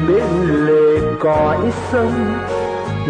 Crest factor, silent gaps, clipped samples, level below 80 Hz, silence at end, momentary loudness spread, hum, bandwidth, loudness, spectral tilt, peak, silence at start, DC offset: 10 dB; none; under 0.1%; -36 dBFS; 0 s; 8 LU; none; 9.8 kHz; -16 LUFS; -7.5 dB/octave; -4 dBFS; 0 s; under 0.1%